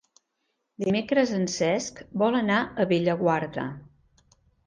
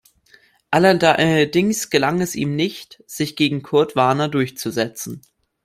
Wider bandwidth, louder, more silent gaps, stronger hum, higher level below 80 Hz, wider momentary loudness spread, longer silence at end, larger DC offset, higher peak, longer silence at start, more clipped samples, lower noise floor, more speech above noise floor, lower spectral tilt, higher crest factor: second, 10 kHz vs 16 kHz; second, -26 LUFS vs -18 LUFS; neither; neither; second, -62 dBFS vs -56 dBFS; second, 10 LU vs 13 LU; first, 0.85 s vs 0.45 s; neither; second, -10 dBFS vs 0 dBFS; about the same, 0.8 s vs 0.7 s; neither; first, -77 dBFS vs -54 dBFS; first, 53 dB vs 36 dB; about the same, -5.5 dB/octave vs -5 dB/octave; about the same, 18 dB vs 18 dB